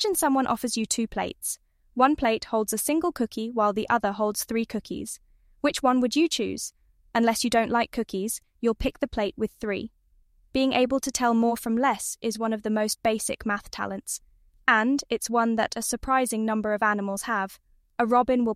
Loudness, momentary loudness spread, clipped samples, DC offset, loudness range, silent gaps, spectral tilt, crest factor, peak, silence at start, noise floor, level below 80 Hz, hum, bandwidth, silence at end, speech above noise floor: -26 LUFS; 10 LU; under 0.1%; under 0.1%; 2 LU; none; -3.5 dB/octave; 20 dB; -6 dBFS; 0 s; -61 dBFS; -50 dBFS; none; 16 kHz; 0 s; 36 dB